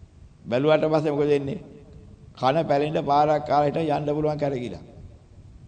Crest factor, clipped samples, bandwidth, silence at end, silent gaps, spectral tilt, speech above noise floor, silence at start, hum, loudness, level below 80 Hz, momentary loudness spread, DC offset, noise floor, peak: 18 dB; under 0.1%; 9.2 kHz; 0 s; none; -7.5 dB/octave; 25 dB; 0.45 s; none; -23 LUFS; -52 dBFS; 11 LU; under 0.1%; -47 dBFS; -8 dBFS